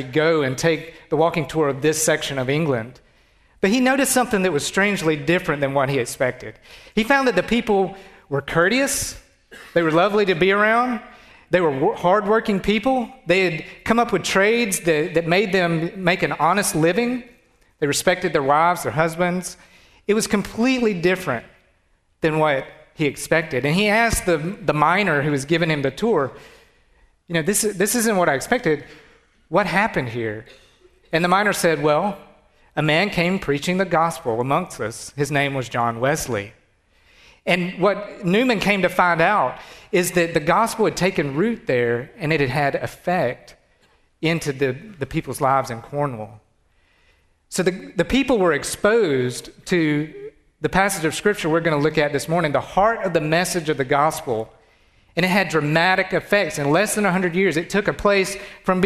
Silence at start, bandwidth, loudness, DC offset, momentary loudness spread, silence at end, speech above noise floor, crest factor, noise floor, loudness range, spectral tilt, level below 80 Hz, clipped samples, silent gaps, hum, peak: 0 s; 14 kHz; -20 LUFS; under 0.1%; 9 LU; 0 s; 42 dB; 18 dB; -62 dBFS; 4 LU; -4.5 dB/octave; -48 dBFS; under 0.1%; none; none; -2 dBFS